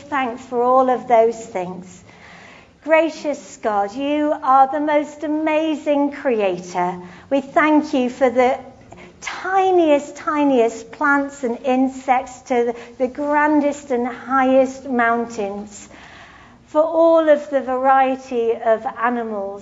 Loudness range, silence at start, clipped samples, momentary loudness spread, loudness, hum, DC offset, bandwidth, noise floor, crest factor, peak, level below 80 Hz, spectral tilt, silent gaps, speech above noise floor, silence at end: 2 LU; 0 s; under 0.1%; 11 LU; -18 LUFS; none; under 0.1%; 8 kHz; -45 dBFS; 16 dB; -2 dBFS; -58 dBFS; -5 dB/octave; none; 27 dB; 0 s